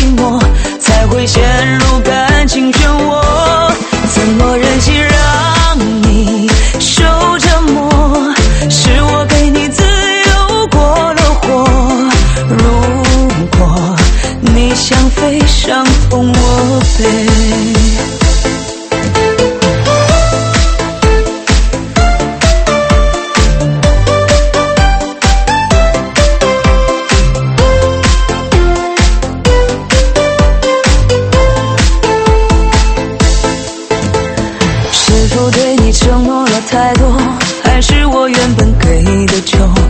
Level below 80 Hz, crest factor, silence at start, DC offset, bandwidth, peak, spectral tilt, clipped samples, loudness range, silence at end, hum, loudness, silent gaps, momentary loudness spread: -12 dBFS; 8 dB; 0 s; under 0.1%; 8.8 kHz; 0 dBFS; -4.5 dB/octave; 0.2%; 2 LU; 0 s; none; -10 LUFS; none; 3 LU